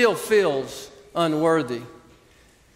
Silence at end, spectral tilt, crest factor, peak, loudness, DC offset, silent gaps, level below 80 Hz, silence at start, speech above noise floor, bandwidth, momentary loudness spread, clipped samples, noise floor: 0.85 s; -5 dB/octave; 18 dB; -6 dBFS; -23 LUFS; under 0.1%; none; -60 dBFS; 0 s; 33 dB; 16 kHz; 14 LU; under 0.1%; -55 dBFS